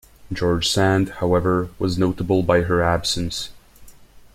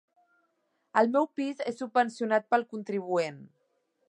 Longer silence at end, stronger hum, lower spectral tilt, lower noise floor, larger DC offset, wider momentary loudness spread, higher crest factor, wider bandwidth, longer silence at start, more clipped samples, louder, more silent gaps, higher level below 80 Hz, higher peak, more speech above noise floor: second, 0.15 s vs 0.65 s; neither; about the same, -5 dB/octave vs -5.5 dB/octave; second, -45 dBFS vs -76 dBFS; neither; about the same, 8 LU vs 9 LU; about the same, 18 dB vs 20 dB; first, 16 kHz vs 10.5 kHz; second, 0.25 s vs 0.95 s; neither; first, -20 LUFS vs -29 LUFS; neither; first, -42 dBFS vs -84 dBFS; first, -4 dBFS vs -10 dBFS; second, 25 dB vs 47 dB